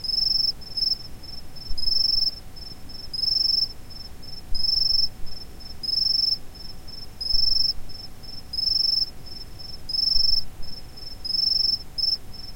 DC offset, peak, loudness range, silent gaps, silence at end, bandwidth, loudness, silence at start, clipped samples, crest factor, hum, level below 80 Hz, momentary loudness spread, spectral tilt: 0.3%; -8 dBFS; 1 LU; none; 0 s; 16.5 kHz; -22 LUFS; 0 s; under 0.1%; 16 dB; none; -40 dBFS; 20 LU; -2.5 dB/octave